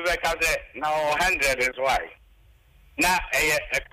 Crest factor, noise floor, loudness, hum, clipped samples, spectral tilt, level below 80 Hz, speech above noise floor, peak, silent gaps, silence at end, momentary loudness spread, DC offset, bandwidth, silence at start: 14 dB; -56 dBFS; -23 LUFS; none; under 0.1%; -2 dB/octave; -44 dBFS; 31 dB; -10 dBFS; none; 0.1 s; 6 LU; under 0.1%; 16 kHz; 0 s